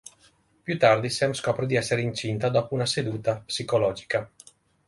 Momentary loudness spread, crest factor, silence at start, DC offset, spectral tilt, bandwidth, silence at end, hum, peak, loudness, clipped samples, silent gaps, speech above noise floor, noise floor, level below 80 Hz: 9 LU; 20 dB; 0.65 s; under 0.1%; -5 dB/octave; 11.5 kHz; 0.6 s; none; -6 dBFS; -25 LUFS; under 0.1%; none; 36 dB; -61 dBFS; -58 dBFS